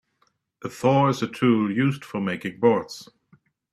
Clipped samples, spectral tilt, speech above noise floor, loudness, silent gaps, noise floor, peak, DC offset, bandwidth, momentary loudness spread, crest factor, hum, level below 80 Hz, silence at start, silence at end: under 0.1%; -7 dB/octave; 46 dB; -23 LUFS; none; -69 dBFS; -6 dBFS; under 0.1%; 13.5 kHz; 17 LU; 18 dB; none; -66 dBFS; 0.65 s; 0.7 s